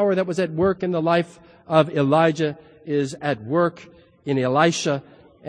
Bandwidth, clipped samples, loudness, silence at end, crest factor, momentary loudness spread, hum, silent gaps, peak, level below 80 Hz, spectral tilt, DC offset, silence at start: 10.5 kHz; under 0.1%; -21 LUFS; 0 s; 20 dB; 8 LU; none; none; -2 dBFS; -58 dBFS; -6 dB/octave; under 0.1%; 0 s